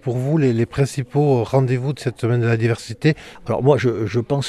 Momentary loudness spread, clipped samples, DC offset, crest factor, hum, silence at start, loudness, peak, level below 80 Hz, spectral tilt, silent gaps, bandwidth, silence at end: 6 LU; under 0.1%; under 0.1%; 16 dB; none; 0.05 s; -19 LUFS; -2 dBFS; -50 dBFS; -7.5 dB/octave; none; 12.5 kHz; 0 s